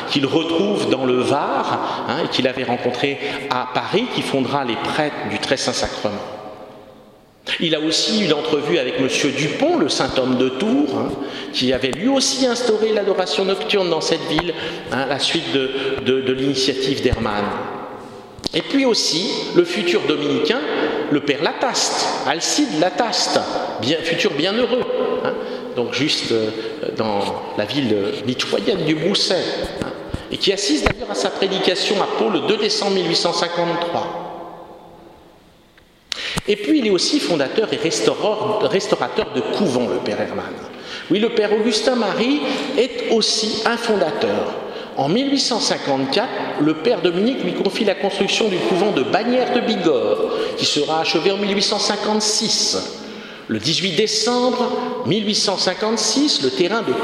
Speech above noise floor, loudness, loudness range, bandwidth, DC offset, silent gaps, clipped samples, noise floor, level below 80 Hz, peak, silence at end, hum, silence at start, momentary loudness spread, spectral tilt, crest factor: 32 dB; -19 LUFS; 3 LU; 14.5 kHz; under 0.1%; none; under 0.1%; -50 dBFS; -46 dBFS; 0 dBFS; 0 s; none; 0 s; 7 LU; -3.5 dB/octave; 20 dB